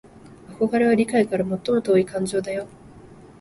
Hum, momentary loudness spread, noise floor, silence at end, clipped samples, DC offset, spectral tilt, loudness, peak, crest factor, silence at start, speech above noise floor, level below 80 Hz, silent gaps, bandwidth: none; 10 LU; -45 dBFS; 0.15 s; under 0.1%; under 0.1%; -6 dB/octave; -22 LUFS; -6 dBFS; 16 dB; 0.15 s; 25 dB; -56 dBFS; none; 11.5 kHz